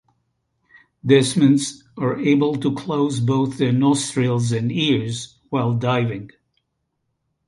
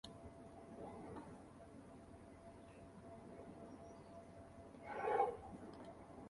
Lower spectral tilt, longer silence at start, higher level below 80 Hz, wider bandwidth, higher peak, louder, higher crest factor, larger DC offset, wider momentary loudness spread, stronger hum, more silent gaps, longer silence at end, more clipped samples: about the same, -6 dB/octave vs -6 dB/octave; first, 1.05 s vs 0.05 s; first, -58 dBFS vs -70 dBFS; about the same, 11.5 kHz vs 11.5 kHz; first, -2 dBFS vs -24 dBFS; first, -20 LUFS vs -50 LUFS; second, 18 dB vs 26 dB; neither; second, 10 LU vs 18 LU; neither; neither; first, 1.2 s vs 0 s; neither